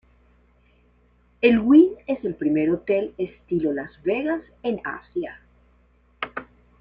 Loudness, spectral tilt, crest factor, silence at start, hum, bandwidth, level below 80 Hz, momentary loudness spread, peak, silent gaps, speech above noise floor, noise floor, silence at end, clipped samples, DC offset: -23 LUFS; -9.5 dB/octave; 20 dB; 1.4 s; 60 Hz at -55 dBFS; 5 kHz; -56 dBFS; 17 LU; -4 dBFS; none; 38 dB; -59 dBFS; 0.35 s; under 0.1%; under 0.1%